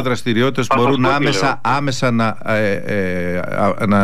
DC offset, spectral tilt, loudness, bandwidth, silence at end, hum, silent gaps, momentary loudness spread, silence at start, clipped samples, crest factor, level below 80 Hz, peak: 6%; -5.5 dB/octave; -17 LUFS; 15 kHz; 0 s; none; none; 5 LU; 0 s; under 0.1%; 12 dB; -48 dBFS; -6 dBFS